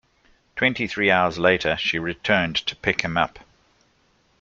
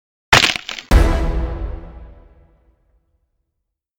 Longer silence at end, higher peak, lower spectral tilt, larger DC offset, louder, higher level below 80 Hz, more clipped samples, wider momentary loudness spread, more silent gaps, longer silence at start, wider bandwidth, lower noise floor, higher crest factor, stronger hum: second, 1 s vs 1.9 s; about the same, -2 dBFS vs 0 dBFS; about the same, -4.5 dB/octave vs -3.5 dB/octave; neither; second, -21 LUFS vs -16 LUFS; second, -52 dBFS vs -22 dBFS; neither; second, 6 LU vs 18 LU; neither; first, 0.55 s vs 0.3 s; second, 7.8 kHz vs 17.5 kHz; second, -63 dBFS vs -77 dBFS; about the same, 22 dB vs 20 dB; neither